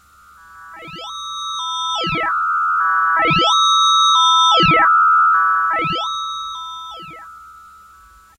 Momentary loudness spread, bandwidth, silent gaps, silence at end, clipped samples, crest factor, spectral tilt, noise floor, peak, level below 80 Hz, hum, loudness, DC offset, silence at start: 19 LU; 11 kHz; none; 0.85 s; under 0.1%; 12 dB; -2 dB/octave; -46 dBFS; -4 dBFS; -50 dBFS; none; -14 LUFS; under 0.1%; 0.55 s